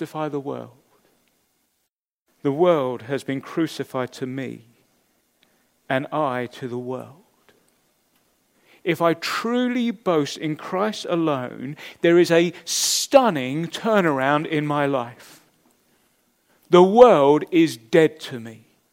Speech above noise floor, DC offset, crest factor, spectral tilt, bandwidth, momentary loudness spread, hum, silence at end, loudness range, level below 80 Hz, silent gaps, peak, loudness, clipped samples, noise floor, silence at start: 57 dB; under 0.1%; 22 dB; -4.5 dB/octave; 16 kHz; 16 LU; none; 0.35 s; 12 LU; -68 dBFS; 2.12-2.26 s; 0 dBFS; -20 LUFS; under 0.1%; -77 dBFS; 0 s